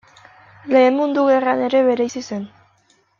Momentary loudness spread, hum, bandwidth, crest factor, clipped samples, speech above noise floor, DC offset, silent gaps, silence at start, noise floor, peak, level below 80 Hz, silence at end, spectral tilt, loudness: 15 LU; none; 7.2 kHz; 16 dB; under 0.1%; 43 dB; under 0.1%; none; 0.65 s; -59 dBFS; -2 dBFS; -68 dBFS; 0.75 s; -5 dB/octave; -17 LUFS